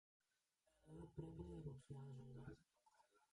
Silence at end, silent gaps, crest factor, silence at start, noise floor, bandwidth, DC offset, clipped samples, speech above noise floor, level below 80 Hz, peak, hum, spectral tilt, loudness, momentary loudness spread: 0.05 s; none; 20 dB; 0.8 s; -88 dBFS; 11 kHz; under 0.1%; under 0.1%; 32 dB; -72 dBFS; -40 dBFS; none; -8.5 dB/octave; -58 LUFS; 7 LU